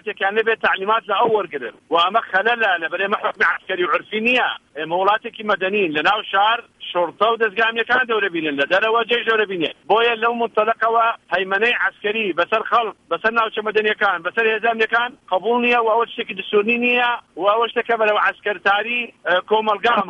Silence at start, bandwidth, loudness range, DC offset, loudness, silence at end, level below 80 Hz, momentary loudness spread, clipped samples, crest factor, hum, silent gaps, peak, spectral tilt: 0.05 s; 7.8 kHz; 1 LU; under 0.1%; -18 LUFS; 0 s; -64 dBFS; 5 LU; under 0.1%; 16 dB; none; none; -4 dBFS; -5 dB/octave